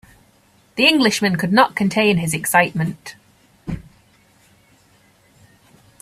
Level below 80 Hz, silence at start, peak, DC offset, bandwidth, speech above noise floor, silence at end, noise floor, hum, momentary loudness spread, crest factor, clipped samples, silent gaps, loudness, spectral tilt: -50 dBFS; 0.75 s; 0 dBFS; under 0.1%; 15.5 kHz; 38 dB; 2.2 s; -55 dBFS; none; 19 LU; 20 dB; under 0.1%; none; -16 LUFS; -4 dB/octave